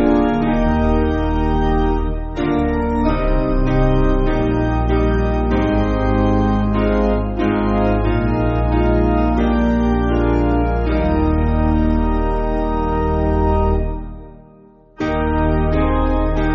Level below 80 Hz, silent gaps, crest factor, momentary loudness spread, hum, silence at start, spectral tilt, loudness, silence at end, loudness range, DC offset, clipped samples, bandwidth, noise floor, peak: -20 dBFS; none; 12 dB; 4 LU; none; 0 s; -7.5 dB/octave; -18 LUFS; 0 s; 3 LU; under 0.1%; under 0.1%; 6.6 kHz; -46 dBFS; -4 dBFS